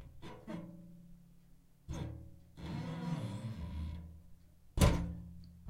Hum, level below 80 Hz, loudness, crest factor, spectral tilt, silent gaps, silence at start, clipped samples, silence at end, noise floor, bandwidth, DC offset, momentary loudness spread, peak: none; -44 dBFS; -40 LUFS; 24 dB; -6 dB/octave; none; 0 s; under 0.1%; 0 s; -62 dBFS; 16 kHz; under 0.1%; 25 LU; -16 dBFS